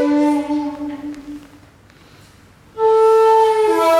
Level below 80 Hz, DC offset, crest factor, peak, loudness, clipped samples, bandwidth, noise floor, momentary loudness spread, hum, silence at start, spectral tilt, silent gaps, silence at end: -54 dBFS; under 0.1%; 12 dB; -4 dBFS; -15 LUFS; under 0.1%; 15 kHz; -47 dBFS; 23 LU; none; 0 s; -4.5 dB/octave; none; 0 s